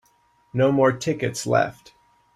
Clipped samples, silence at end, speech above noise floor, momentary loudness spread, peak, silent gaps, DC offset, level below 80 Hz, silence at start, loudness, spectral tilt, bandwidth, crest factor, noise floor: under 0.1%; 0.65 s; 41 dB; 9 LU; -6 dBFS; none; under 0.1%; -60 dBFS; 0.55 s; -22 LUFS; -5.5 dB/octave; 14.5 kHz; 18 dB; -62 dBFS